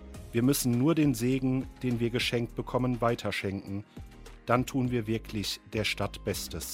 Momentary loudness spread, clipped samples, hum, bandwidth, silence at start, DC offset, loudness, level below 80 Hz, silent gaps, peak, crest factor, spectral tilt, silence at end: 11 LU; under 0.1%; none; 16.5 kHz; 0 s; under 0.1%; -30 LUFS; -48 dBFS; none; -8 dBFS; 22 dB; -5 dB/octave; 0 s